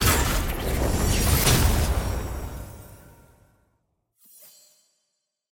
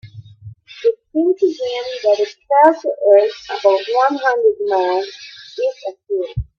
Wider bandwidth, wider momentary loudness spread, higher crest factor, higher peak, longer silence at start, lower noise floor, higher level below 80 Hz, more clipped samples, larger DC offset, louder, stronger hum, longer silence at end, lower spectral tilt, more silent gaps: first, 17 kHz vs 7 kHz; first, 19 LU vs 11 LU; about the same, 20 dB vs 16 dB; second, -6 dBFS vs 0 dBFS; about the same, 0 s vs 0.05 s; first, -78 dBFS vs -39 dBFS; first, -30 dBFS vs -44 dBFS; neither; neither; second, -23 LUFS vs -16 LUFS; neither; first, 2.55 s vs 0.15 s; second, -4 dB/octave vs -6 dB/octave; neither